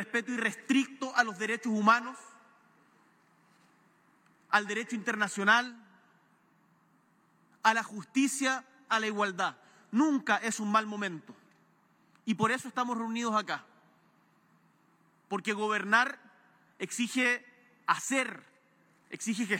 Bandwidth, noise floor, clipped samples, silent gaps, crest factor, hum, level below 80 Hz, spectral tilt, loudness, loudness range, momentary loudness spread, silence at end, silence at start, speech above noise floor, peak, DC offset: 16.5 kHz; -67 dBFS; under 0.1%; none; 24 dB; none; under -90 dBFS; -3 dB/octave; -30 LUFS; 4 LU; 12 LU; 0 s; 0 s; 37 dB; -10 dBFS; under 0.1%